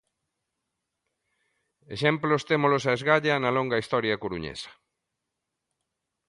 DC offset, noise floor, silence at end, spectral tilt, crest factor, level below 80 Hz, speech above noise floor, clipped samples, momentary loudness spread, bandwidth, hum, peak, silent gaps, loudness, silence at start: under 0.1%; -84 dBFS; 1.55 s; -5.5 dB/octave; 22 dB; -62 dBFS; 58 dB; under 0.1%; 14 LU; 11.5 kHz; none; -6 dBFS; none; -25 LUFS; 1.9 s